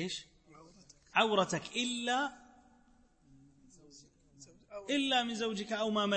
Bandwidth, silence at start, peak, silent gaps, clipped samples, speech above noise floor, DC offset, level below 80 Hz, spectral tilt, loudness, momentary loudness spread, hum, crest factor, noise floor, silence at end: 8.8 kHz; 0 s; -14 dBFS; none; under 0.1%; 33 dB; under 0.1%; -70 dBFS; -3.5 dB/octave; -33 LUFS; 11 LU; none; 24 dB; -66 dBFS; 0 s